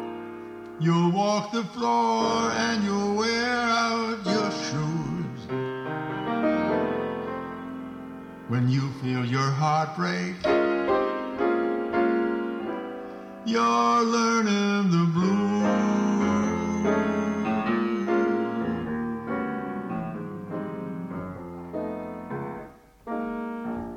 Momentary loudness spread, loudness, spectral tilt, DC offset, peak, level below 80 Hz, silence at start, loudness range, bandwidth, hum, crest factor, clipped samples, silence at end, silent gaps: 13 LU; -26 LUFS; -6 dB/octave; under 0.1%; -12 dBFS; -58 dBFS; 0 s; 9 LU; 9.8 kHz; none; 14 dB; under 0.1%; 0 s; none